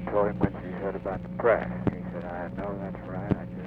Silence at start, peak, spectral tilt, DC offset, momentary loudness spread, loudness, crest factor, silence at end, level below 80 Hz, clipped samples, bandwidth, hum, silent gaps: 0 s; -10 dBFS; -10 dB/octave; under 0.1%; 11 LU; -30 LUFS; 20 dB; 0 s; -46 dBFS; under 0.1%; 5 kHz; 60 Hz at -40 dBFS; none